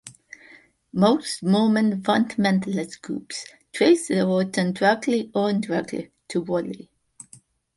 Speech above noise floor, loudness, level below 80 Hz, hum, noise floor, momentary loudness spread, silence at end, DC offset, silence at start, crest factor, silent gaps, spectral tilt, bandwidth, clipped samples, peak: 31 dB; -22 LUFS; -64 dBFS; none; -53 dBFS; 15 LU; 1 s; under 0.1%; 0.05 s; 18 dB; none; -5.5 dB/octave; 11.5 kHz; under 0.1%; -4 dBFS